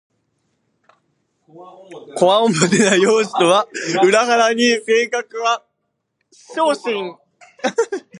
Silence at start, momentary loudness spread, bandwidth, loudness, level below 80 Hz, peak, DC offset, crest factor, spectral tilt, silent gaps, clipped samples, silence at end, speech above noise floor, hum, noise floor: 1.55 s; 11 LU; 11.5 kHz; -16 LUFS; -70 dBFS; 0 dBFS; under 0.1%; 18 dB; -3.5 dB/octave; none; under 0.1%; 0 s; 57 dB; none; -73 dBFS